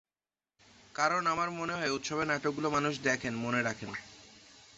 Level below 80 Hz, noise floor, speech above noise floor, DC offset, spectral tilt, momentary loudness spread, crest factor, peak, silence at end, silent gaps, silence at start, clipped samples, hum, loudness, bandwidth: -68 dBFS; under -90 dBFS; over 58 dB; under 0.1%; -3 dB/octave; 13 LU; 20 dB; -14 dBFS; 0.1 s; none; 0.95 s; under 0.1%; none; -32 LUFS; 8 kHz